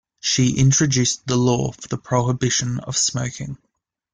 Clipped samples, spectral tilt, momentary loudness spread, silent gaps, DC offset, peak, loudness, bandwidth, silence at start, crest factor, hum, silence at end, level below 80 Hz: under 0.1%; -4 dB/octave; 13 LU; none; under 0.1%; -6 dBFS; -19 LUFS; 9.6 kHz; 0.25 s; 16 dB; none; 0.6 s; -48 dBFS